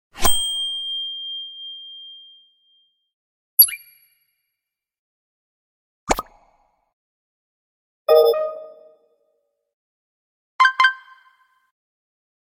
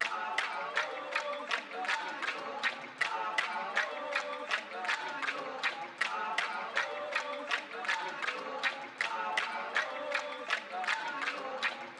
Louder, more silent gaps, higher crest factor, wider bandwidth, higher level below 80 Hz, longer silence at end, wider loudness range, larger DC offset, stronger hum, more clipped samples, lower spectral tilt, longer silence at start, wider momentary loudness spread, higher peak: first, -18 LUFS vs -35 LUFS; first, 3.14-3.57 s, 4.99-6.07 s, 6.93-8.05 s, 9.74-10.59 s vs none; about the same, 24 dB vs 22 dB; first, 16.5 kHz vs 14 kHz; first, -44 dBFS vs under -90 dBFS; first, 1.5 s vs 0 s; first, 11 LU vs 0 LU; neither; neither; neither; about the same, 0 dB/octave vs -0.5 dB/octave; first, 0.15 s vs 0 s; first, 23 LU vs 3 LU; first, 0 dBFS vs -14 dBFS